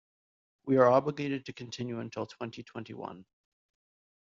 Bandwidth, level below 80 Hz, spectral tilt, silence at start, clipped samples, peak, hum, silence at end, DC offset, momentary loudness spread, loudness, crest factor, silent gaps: 7.4 kHz; -74 dBFS; -5.5 dB/octave; 0.65 s; under 0.1%; -10 dBFS; none; 1 s; under 0.1%; 20 LU; -30 LUFS; 22 dB; none